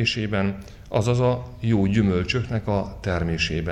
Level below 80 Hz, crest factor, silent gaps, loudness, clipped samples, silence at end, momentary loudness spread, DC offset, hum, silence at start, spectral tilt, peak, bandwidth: -40 dBFS; 16 dB; none; -23 LUFS; under 0.1%; 0 s; 7 LU; under 0.1%; none; 0 s; -6.5 dB/octave; -6 dBFS; 10 kHz